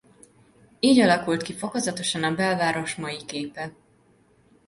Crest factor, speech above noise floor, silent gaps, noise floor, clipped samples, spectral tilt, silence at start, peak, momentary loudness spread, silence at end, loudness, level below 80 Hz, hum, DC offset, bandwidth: 20 dB; 36 dB; none; -60 dBFS; under 0.1%; -4 dB/octave; 0.85 s; -6 dBFS; 14 LU; 0.95 s; -24 LUFS; -62 dBFS; none; under 0.1%; 11.5 kHz